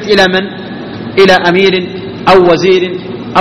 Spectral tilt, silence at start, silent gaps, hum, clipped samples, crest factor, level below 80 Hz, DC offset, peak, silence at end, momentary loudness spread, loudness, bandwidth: -5.5 dB/octave; 0 s; none; none; 1%; 10 dB; -42 dBFS; under 0.1%; 0 dBFS; 0 s; 15 LU; -8 LUFS; 10 kHz